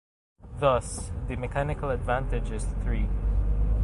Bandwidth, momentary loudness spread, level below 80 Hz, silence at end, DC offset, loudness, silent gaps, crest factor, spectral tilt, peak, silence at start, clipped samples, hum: 11.5 kHz; 9 LU; -30 dBFS; 0 s; under 0.1%; -29 LUFS; none; 18 dB; -6 dB/octave; -10 dBFS; 0.4 s; under 0.1%; none